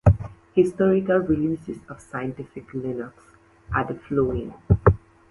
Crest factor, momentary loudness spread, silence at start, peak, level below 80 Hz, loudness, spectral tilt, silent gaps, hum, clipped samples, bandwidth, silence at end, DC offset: 22 dB; 15 LU; 0.05 s; -2 dBFS; -36 dBFS; -24 LUFS; -9.5 dB/octave; none; none; under 0.1%; 11.5 kHz; 0.35 s; under 0.1%